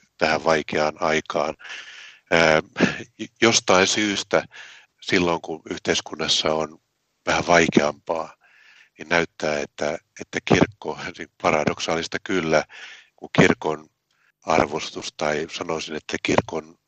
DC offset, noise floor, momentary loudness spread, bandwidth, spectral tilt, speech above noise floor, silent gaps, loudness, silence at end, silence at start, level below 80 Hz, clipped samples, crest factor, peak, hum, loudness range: under 0.1%; -66 dBFS; 17 LU; 9 kHz; -3.5 dB/octave; 44 dB; none; -22 LUFS; 0.2 s; 0.2 s; -56 dBFS; under 0.1%; 22 dB; 0 dBFS; none; 4 LU